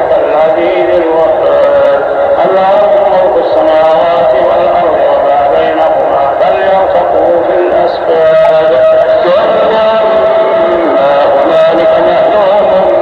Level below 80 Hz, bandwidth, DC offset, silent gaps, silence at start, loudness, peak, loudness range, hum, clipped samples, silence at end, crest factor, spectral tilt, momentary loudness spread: -42 dBFS; 5.6 kHz; under 0.1%; none; 0 s; -7 LUFS; 0 dBFS; 1 LU; none; 0.5%; 0 s; 6 dB; -6.5 dB/octave; 2 LU